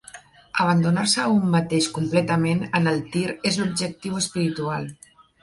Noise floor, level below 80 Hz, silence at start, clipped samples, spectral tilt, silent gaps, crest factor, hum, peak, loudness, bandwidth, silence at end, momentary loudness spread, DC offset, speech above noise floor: -46 dBFS; -58 dBFS; 0.15 s; under 0.1%; -5 dB/octave; none; 18 dB; none; -6 dBFS; -22 LUFS; 11.5 kHz; 0.5 s; 8 LU; under 0.1%; 24 dB